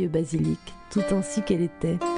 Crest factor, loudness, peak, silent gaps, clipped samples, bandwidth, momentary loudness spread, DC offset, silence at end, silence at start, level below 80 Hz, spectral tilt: 16 dB; -27 LUFS; -10 dBFS; none; under 0.1%; 10.5 kHz; 4 LU; under 0.1%; 0 s; 0 s; -48 dBFS; -6.5 dB/octave